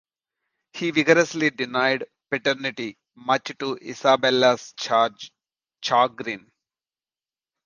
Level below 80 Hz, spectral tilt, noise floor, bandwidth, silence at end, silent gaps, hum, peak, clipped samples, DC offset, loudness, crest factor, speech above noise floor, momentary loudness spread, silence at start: -70 dBFS; -4 dB/octave; under -90 dBFS; 9.8 kHz; 1.25 s; none; none; -2 dBFS; under 0.1%; under 0.1%; -22 LUFS; 22 dB; over 68 dB; 16 LU; 0.75 s